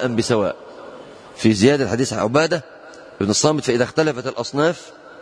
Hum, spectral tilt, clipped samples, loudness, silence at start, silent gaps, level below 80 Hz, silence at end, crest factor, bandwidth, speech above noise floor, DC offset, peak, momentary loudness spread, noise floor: none; -4.5 dB/octave; under 0.1%; -19 LUFS; 0 s; none; -56 dBFS; 0 s; 18 dB; 10.5 kHz; 21 dB; under 0.1%; -2 dBFS; 22 LU; -39 dBFS